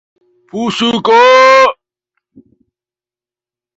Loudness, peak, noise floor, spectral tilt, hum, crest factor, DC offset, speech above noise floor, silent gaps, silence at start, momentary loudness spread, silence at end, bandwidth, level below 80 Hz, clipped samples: -8 LUFS; 0 dBFS; under -90 dBFS; -3.5 dB/octave; none; 12 dB; under 0.1%; over 82 dB; none; 0.55 s; 14 LU; 2.05 s; 8 kHz; -58 dBFS; under 0.1%